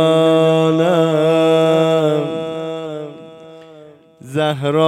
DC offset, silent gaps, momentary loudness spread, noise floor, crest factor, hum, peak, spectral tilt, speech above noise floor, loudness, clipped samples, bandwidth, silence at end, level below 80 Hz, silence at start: under 0.1%; none; 13 LU; -42 dBFS; 14 dB; none; -2 dBFS; -6.5 dB/octave; 29 dB; -15 LUFS; under 0.1%; 13.5 kHz; 0 s; -68 dBFS; 0 s